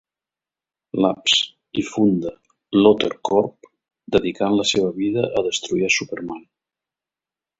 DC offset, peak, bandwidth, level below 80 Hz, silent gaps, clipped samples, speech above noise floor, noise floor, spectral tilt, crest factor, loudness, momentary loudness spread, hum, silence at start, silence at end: under 0.1%; 0 dBFS; 8 kHz; -56 dBFS; none; under 0.1%; 70 dB; -90 dBFS; -4 dB/octave; 20 dB; -20 LUFS; 13 LU; none; 0.95 s; 1.2 s